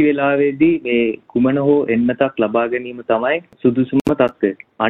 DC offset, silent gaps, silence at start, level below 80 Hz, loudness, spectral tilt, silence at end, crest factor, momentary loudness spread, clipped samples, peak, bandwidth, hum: under 0.1%; 4.01-4.05 s; 0 s; -52 dBFS; -17 LUFS; -8 dB/octave; 0 s; 14 dB; 6 LU; under 0.1%; -2 dBFS; 6.2 kHz; none